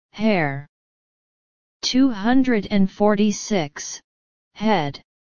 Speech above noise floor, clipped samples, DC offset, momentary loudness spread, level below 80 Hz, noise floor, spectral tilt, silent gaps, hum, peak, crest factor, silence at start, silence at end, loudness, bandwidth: over 70 dB; under 0.1%; 2%; 13 LU; -50 dBFS; under -90 dBFS; -5 dB/octave; 0.69-1.80 s, 4.04-4.51 s; none; -4 dBFS; 18 dB; 0.1 s; 0.25 s; -21 LUFS; 7.2 kHz